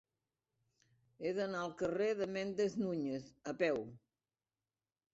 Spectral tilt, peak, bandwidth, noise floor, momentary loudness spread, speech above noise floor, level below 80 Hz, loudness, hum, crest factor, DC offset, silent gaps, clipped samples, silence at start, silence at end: -5 dB/octave; -22 dBFS; 8 kHz; under -90 dBFS; 8 LU; over 52 dB; -76 dBFS; -39 LUFS; none; 20 dB; under 0.1%; none; under 0.1%; 1.2 s; 1.15 s